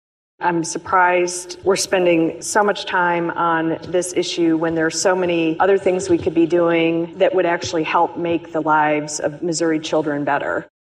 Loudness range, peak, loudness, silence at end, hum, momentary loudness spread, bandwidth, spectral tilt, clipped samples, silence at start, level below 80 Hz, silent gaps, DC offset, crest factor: 2 LU; -4 dBFS; -18 LUFS; 0.3 s; none; 6 LU; 14 kHz; -4 dB/octave; under 0.1%; 0.4 s; -58 dBFS; none; under 0.1%; 14 dB